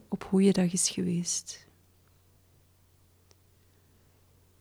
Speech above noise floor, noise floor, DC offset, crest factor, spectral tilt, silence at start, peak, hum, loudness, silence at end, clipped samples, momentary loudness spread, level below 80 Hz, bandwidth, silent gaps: 36 dB; -63 dBFS; under 0.1%; 20 dB; -4.5 dB/octave; 0.1 s; -12 dBFS; none; -27 LUFS; 3.05 s; under 0.1%; 14 LU; -66 dBFS; 15 kHz; none